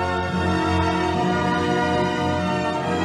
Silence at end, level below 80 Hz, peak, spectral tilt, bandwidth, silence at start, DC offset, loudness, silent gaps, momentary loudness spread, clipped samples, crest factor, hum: 0 s; -42 dBFS; -10 dBFS; -6 dB/octave; 12 kHz; 0 s; under 0.1%; -22 LUFS; none; 2 LU; under 0.1%; 12 dB; none